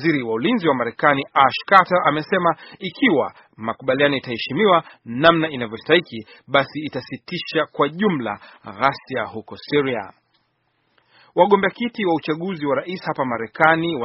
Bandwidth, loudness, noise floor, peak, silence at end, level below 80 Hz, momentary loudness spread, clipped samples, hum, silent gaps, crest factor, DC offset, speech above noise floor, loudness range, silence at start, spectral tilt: 6 kHz; -20 LUFS; -68 dBFS; 0 dBFS; 0 s; -60 dBFS; 13 LU; under 0.1%; none; none; 20 dB; under 0.1%; 48 dB; 6 LU; 0 s; -3 dB/octave